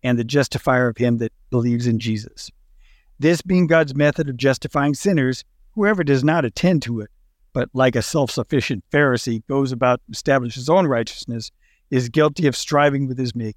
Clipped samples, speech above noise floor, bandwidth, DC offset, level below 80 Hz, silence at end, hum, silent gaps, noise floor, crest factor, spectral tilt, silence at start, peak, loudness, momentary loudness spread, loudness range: under 0.1%; 32 dB; 16 kHz; under 0.1%; -50 dBFS; 0.05 s; none; none; -51 dBFS; 16 dB; -6 dB/octave; 0.05 s; -4 dBFS; -20 LUFS; 11 LU; 2 LU